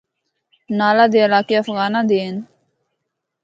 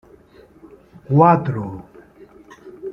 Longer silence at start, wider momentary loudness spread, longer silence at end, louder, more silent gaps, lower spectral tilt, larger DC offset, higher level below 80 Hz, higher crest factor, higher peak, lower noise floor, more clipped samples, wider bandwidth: second, 0.7 s vs 1.1 s; second, 12 LU vs 22 LU; first, 1 s vs 0 s; about the same, -16 LUFS vs -16 LUFS; neither; second, -6.5 dB/octave vs -10.5 dB/octave; neither; second, -70 dBFS vs -54 dBFS; about the same, 18 dB vs 20 dB; about the same, 0 dBFS vs -2 dBFS; first, -77 dBFS vs -48 dBFS; neither; first, 7.6 kHz vs 6.2 kHz